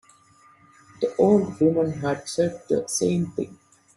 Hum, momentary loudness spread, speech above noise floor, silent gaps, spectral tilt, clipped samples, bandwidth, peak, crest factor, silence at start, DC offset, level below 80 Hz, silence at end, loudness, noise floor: none; 10 LU; 33 dB; none; -6 dB/octave; under 0.1%; 12.5 kHz; -6 dBFS; 18 dB; 1 s; under 0.1%; -60 dBFS; 0.4 s; -23 LUFS; -56 dBFS